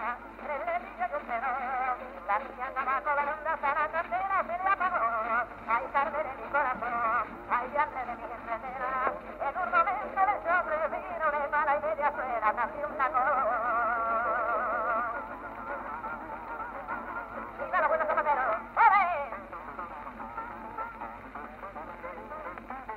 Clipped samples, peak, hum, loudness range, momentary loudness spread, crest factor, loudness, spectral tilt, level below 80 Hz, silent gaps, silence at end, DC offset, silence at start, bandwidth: under 0.1%; -10 dBFS; none; 5 LU; 13 LU; 22 dB; -30 LUFS; -6.5 dB/octave; -58 dBFS; none; 0 s; under 0.1%; 0 s; 13 kHz